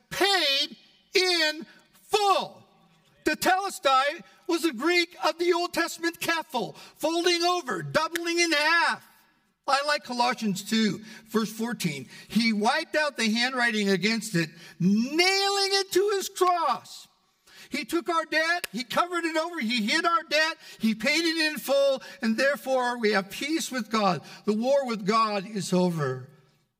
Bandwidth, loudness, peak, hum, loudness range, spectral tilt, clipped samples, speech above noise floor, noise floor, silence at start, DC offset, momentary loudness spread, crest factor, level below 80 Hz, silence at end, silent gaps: 16 kHz; -25 LUFS; -8 dBFS; none; 3 LU; -3.5 dB/octave; under 0.1%; 38 dB; -64 dBFS; 0.1 s; under 0.1%; 8 LU; 18 dB; -70 dBFS; 0.55 s; none